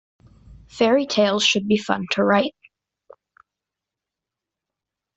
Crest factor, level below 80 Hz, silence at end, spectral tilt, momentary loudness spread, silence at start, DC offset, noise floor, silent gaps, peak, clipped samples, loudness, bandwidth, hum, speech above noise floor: 20 dB; -58 dBFS; 2.65 s; -4 dB/octave; 5 LU; 0.5 s; under 0.1%; -86 dBFS; none; -4 dBFS; under 0.1%; -19 LUFS; 8.2 kHz; none; 67 dB